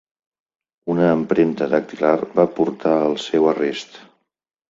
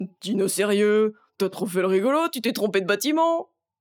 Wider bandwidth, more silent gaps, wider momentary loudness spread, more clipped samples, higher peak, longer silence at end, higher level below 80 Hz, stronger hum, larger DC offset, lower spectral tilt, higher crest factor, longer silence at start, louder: second, 7.8 kHz vs over 20 kHz; neither; about the same, 7 LU vs 7 LU; neither; first, -2 dBFS vs -8 dBFS; first, 0.7 s vs 0.35 s; first, -62 dBFS vs -80 dBFS; neither; neither; first, -6.5 dB/octave vs -4.5 dB/octave; about the same, 18 dB vs 16 dB; first, 0.85 s vs 0 s; first, -19 LUFS vs -23 LUFS